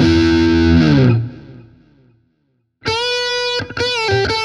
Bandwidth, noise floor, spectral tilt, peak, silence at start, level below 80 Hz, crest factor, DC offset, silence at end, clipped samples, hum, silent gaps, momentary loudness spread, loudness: 11 kHz; -65 dBFS; -6 dB/octave; 0 dBFS; 0 s; -32 dBFS; 14 dB; under 0.1%; 0 s; under 0.1%; none; none; 8 LU; -15 LUFS